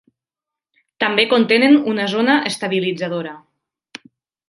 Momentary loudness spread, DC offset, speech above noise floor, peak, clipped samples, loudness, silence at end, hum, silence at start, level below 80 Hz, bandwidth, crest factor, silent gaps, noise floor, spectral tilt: 11 LU; under 0.1%; 71 dB; 0 dBFS; under 0.1%; -16 LUFS; 1.1 s; none; 1 s; -68 dBFS; 11.5 kHz; 18 dB; none; -87 dBFS; -4.5 dB/octave